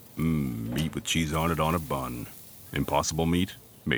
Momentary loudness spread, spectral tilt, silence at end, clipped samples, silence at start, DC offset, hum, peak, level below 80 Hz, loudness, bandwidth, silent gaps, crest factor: 11 LU; -5 dB/octave; 0 s; under 0.1%; 0 s; under 0.1%; none; -10 dBFS; -44 dBFS; -29 LUFS; over 20 kHz; none; 20 dB